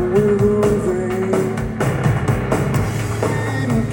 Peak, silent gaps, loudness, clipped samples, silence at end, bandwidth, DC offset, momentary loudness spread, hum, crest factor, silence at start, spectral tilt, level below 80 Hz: -2 dBFS; none; -18 LUFS; under 0.1%; 0 s; 17 kHz; under 0.1%; 5 LU; none; 14 dB; 0 s; -7 dB/octave; -34 dBFS